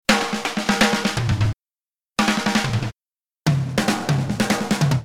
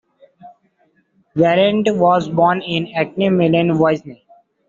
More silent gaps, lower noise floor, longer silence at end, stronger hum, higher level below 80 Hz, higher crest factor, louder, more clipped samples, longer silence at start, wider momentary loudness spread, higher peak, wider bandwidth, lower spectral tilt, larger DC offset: neither; first, under -90 dBFS vs -60 dBFS; second, 0 s vs 0.55 s; neither; first, -42 dBFS vs -56 dBFS; about the same, 18 dB vs 16 dB; second, -21 LUFS vs -16 LUFS; neither; second, 0.1 s vs 0.45 s; about the same, 7 LU vs 7 LU; about the same, -2 dBFS vs -2 dBFS; first, 17.5 kHz vs 7.6 kHz; about the same, -4.5 dB/octave vs -5 dB/octave; neither